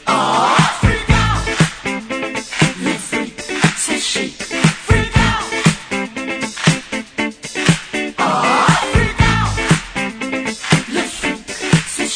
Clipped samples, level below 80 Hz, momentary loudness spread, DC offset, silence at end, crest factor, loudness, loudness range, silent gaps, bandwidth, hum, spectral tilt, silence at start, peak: under 0.1%; -28 dBFS; 9 LU; under 0.1%; 0 s; 16 dB; -16 LUFS; 2 LU; none; 10 kHz; none; -4 dB/octave; 0 s; 0 dBFS